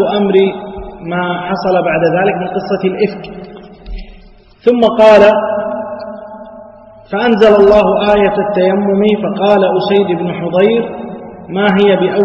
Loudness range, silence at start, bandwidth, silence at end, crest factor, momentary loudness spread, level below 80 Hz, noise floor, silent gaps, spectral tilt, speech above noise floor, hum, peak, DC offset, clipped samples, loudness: 5 LU; 0 s; 7.6 kHz; 0 s; 12 dB; 20 LU; -38 dBFS; -39 dBFS; none; -7.5 dB/octave; 29 dB; none; 0 dBFS; under 0.1%; 0.3%; -11 LUFS